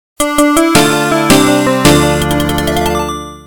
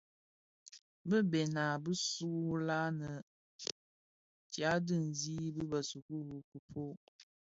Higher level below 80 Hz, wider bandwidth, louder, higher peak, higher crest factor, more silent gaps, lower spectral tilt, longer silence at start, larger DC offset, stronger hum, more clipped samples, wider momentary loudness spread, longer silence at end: first, -28 dBFS vs -72 dBFS; first, 18 kHz vs 7.6 kHz; first, -10 LUFS vs -38 LUFS; first, 0 dBFS vs -16 dBFS; second, 10 dB vs 22 dB; second, none vs 0.81-1.05 s, 3.22-3.59 s, 3.72-4.50 s, 6.02-6.09 s, 6.44-6.52 s, 6.59-6.68 s, 6.97-7.19 s; about the same, -4 dB/octave vs -5 dB/octave; second, 0.15 s vs 0.65 s; first, 2% vs under 0.1%; neither; first, 0.6% vs under 0.1%; second, 6 LU vs 15 LU; second, 0 s vs 0.35 s